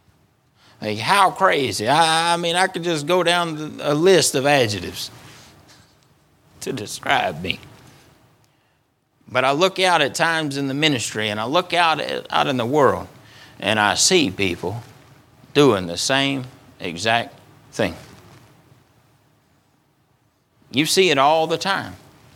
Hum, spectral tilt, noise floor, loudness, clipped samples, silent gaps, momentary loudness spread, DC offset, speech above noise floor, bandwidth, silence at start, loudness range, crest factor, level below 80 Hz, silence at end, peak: none; -3.5 dB/octave; -65 dBFS; -19 LUFS; under 0.1%; none; 14 LU; under 0.1%; 46 dB; 17.5 kHz; 0.8 s; 9 LU; 20 dB; -60 dBFS; 0.4 s; 0 dBFS